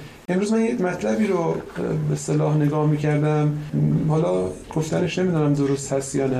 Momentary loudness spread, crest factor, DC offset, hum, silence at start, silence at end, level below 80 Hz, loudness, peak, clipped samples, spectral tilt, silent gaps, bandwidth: 5 LU; 12 dB; under 0.1%; none; 0 s; 0 s; -50 dBFS; -22 LUFS; -8 dBFS; under 0.1%; -7 dB/octave; none; 12 kHz